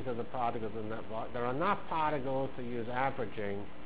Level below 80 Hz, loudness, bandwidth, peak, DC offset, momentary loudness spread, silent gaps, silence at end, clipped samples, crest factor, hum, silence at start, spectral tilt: -58 dBFS; -36 LUFS; 4 kHz; -18 dBFS; 1%; 7 LU; none; 0 s; under 0.1%; 18 dB; none; 0 s; -5 dB/octave